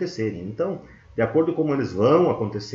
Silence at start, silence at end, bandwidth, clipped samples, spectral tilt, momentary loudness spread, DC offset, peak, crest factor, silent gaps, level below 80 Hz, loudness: 0 s; 0 s; 7.4 kHz; under 0.1%; -7.5 dB/octave; 10 LU; under 0.1%; -6 dBFS; 16 dB; none; -56 dBFS; -22 LUFS